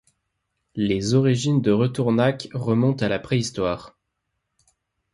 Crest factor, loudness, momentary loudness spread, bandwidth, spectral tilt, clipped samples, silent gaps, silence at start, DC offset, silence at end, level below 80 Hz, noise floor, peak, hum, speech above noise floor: 16 dB; -22 LUFS; 7 LU; 11.5 kHz; -6.5 dB/octave; under 0.1%; none; 0.75 s; under 0.1%; 1.25 s; -52 dBFS; -78 dBFS; -6 dBFS; none; 57 dB